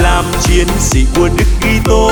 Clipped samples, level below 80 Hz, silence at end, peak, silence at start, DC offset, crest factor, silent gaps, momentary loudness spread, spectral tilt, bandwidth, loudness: under 0.1%; -14 dBFS; 0 s; 0 dBFS; 0 s; under 0.1%; 10 dB; none; 2 LU; -4.5 dB/octave; over 20 kHz; -11 LUFS